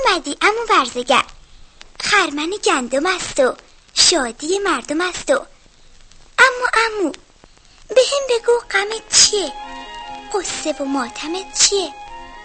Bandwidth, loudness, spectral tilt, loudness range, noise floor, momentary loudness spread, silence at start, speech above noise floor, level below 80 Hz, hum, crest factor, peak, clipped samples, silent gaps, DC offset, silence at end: 9 kHz; -17 LUFS; 0 dB/octave; 2 LU; -48 dBFS; 14 LU; 0 s; 30 dB; -46 dBFS; none; 18 dB; 0 dBFS; under 0.1%; none; under 0.1%; 0 s